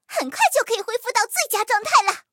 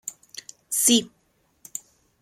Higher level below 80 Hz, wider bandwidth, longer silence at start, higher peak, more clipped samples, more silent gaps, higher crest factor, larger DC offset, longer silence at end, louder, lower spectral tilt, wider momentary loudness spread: second, -80 dBFS vs -70 dBFS; about the same, 17.5 kHz vs 16.5 kHz; about the same, 0.1 s vs 0.05 s; about the same, -2 dBFS vs -4 dBFS; neither; neither; about the same, 20 dB vs 24 dB; neither; second, 0.1 s vs 1.15 s; about the same, -20 LUFS vs -20 LUFS; second, 1 dB/octave vs -1 dB/octave; second, 7 LU vs 22 LU